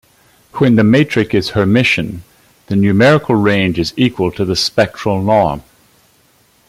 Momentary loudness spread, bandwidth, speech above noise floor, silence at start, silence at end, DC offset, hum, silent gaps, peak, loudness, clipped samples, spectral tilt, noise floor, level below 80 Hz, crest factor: 8 LU; 15 kHz; 40 dB; 0.55 s; 1.1 s; under 0.1%; none; none; 0 dBFS; -13 LUFS; under 0.1%; -6 dB/octave; -53 dBFS; -44 dBFS; 14 dB